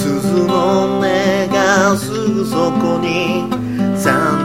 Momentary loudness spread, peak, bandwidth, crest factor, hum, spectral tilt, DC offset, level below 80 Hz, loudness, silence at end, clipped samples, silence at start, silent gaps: 5 LU; 0 dBFS; 16.5 kHz; 14 dB; none; -5.5 dB/octave; 0.4%; -46 dBFS; -15 LUFS; 0 s; under 0.1%; 0 s; none